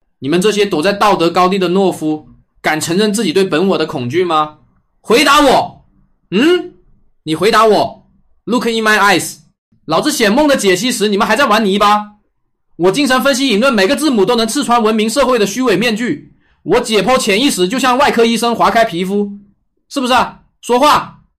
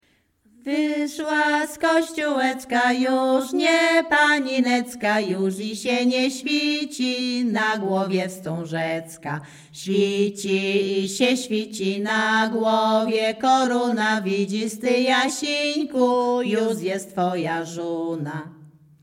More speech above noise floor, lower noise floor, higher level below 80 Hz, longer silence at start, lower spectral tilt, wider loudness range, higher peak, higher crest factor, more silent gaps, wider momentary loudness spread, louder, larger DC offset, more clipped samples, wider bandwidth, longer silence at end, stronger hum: first, 52 dB vs 40 dB; about the same, -64 dBFS vs -62 dBFS; first, -46 dBFS vs -68 dBFS; second, 0.2 s vs 0.65 s; about the same, -4 dB/octave vs -4 dB/octave; second, 2 LU vs 5 LU; first, 0 dBFS vs -6 dBFS; about the same, 12 dB vs 16 dB; first, 9.58-9.72 s vs none; about the same, 10 LU vs 9 LU; first, -12 LUFS vs -22 LUFS; neither; neither; about the same, 15.5 kHz vs 16.5 kHz; about the same, 0.3 s vs 0.35 s; neither